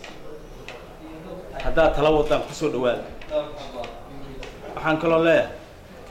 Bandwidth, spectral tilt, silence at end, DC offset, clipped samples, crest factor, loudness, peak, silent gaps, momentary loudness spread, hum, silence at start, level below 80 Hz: 15.5 kHz; -5.5 dB/octave; 0 s; under 0.1%; under 0.1%; 16 dB; -23 LUFS; -8 dBFS; none; 22 LU; none; 0 s; -38 dBFS